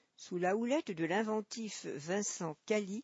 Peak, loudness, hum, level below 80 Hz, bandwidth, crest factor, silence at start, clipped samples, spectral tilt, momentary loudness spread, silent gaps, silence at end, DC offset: -22 dBFS; -37 LUFS; none; -88 dBFS; 8 kHz; 16 dB; 0.2 s; under 0.1%; -4 dB/octave; 8 LU; none; 0 s; under 0.1%